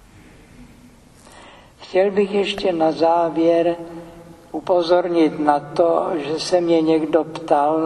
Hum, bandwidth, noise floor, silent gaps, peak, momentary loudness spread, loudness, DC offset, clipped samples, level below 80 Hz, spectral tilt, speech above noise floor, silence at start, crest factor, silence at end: none; 11.5 kHz; -47 dBFS; none; 0 dBFS; 6 LU; -18 LUFS; under 0.1%; under 0.1%; -54 dBFS; -5.5 dB/octave; 29 dB; 0.6 s; 18 dB; 0 s